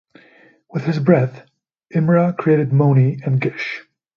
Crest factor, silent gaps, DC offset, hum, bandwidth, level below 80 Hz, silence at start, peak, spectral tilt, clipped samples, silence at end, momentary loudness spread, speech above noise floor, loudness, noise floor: 18 dB; none; under 0.1%; none; 6.6 kHz; -60 dBFS; 0.75 s; 0 dBFS; -9.5 dB/octave; under 0.1%; 0.35 s; 11 LU; 35 dB; -17 LUFS; -51 dBFS